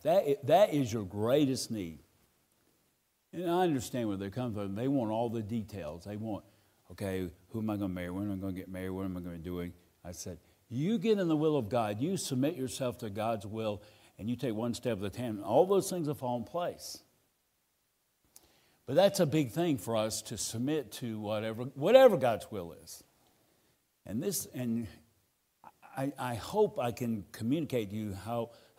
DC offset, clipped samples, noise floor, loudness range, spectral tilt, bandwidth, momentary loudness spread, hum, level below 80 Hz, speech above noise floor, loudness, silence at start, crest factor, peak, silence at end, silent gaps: under 0.1%; under 0.1%; -77 dBFS; 9 LU; -5.5 dB/octave; 16 kHz; 15 LU; none; -66 dBFS; 45 dB; -32 LUFS; 0.05 s; 24 dB; -8 dBFS; 0.25 s; none